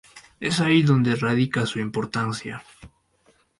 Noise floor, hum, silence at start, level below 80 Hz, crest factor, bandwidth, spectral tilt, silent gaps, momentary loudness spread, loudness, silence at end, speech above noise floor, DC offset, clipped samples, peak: -62 dBFS; none; 0.15 s; -58 dBFS; 16 dB; 11.5 kHz; -6 dB/octave; none; 14 LU; -22 LUFS; 0.75 s; 41 dB; under 0.1%; under 0.1%; -8 dBFS